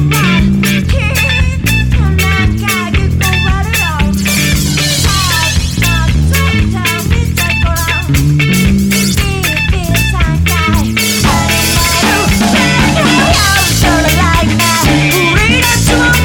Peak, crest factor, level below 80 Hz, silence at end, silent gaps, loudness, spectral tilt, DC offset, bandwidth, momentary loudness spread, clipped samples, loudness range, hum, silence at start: 0 dBFS; 10 dB; -18 dBFS; 0 s; none; -10 LUFS; -4 dB/octave; under 0.1%; over 20 kHz; 4 LU; under 0.1%; 3 LU; none; 0 s